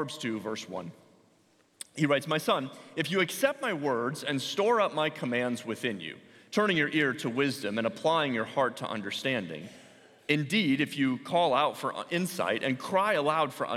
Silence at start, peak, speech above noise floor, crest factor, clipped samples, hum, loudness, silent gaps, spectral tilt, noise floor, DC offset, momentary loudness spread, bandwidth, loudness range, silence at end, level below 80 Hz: 0 s; -10 dBFS; 36 dB; 20 dB; under 0.1%; none; -29 LUFS; none; -4.5 dB/octave; -66 dBFS; under 0.1%; 12 LU; 16.5 kHz; 3 LU; 0 s; -78 dBFS